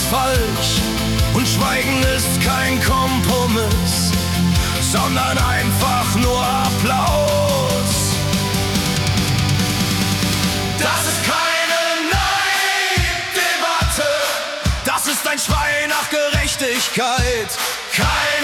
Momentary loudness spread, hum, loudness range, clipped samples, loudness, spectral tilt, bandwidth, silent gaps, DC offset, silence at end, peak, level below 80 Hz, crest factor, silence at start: 2 LU; none; 1 LU; under 0.1%; -17 LUFS; -3.5 dB/octave; 18 kHz; none; under 0.1%; 0 s; -4 dBFS; -30 dBFS; 12 dB; 0 s